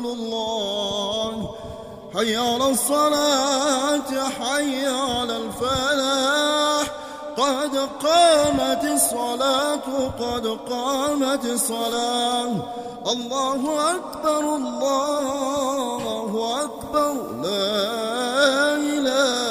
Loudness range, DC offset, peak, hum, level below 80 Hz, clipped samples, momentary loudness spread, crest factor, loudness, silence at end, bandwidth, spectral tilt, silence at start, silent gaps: 4 LU; under 0.1%; -4 dBFS; none; -52 dBFS; under 0.1%; 8 LU; 18 dB; -22 LUFS; 0 s; 15.5 kHz; -2.5 dB/octave; 0 s; none